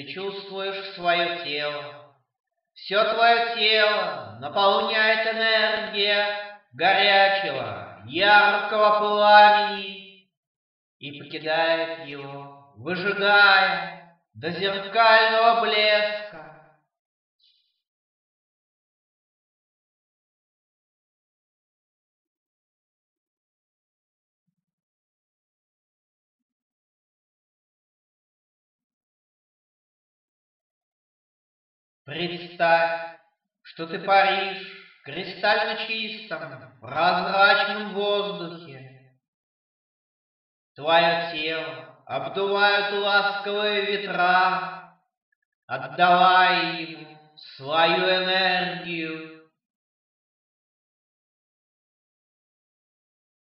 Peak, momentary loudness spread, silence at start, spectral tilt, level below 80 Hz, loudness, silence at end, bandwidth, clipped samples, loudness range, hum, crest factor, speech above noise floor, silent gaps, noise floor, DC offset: -2 dBFS; 20 LU; 0 s; -6.5 dB/octave; -76 dBFS; -21 LUFS; 4.2 s; 5.8 kHz; under 0.1%; 9 LU; none; 24 dB; 41 dB; 2.40-2.44 s, 10.37-11.00 s, 16.99-17.39 s, 17.87-24.46 s, 24.73-32.05 s, 39.28-40.75 s, 45.17-45.68 s; -63 dBFS; under 0.1%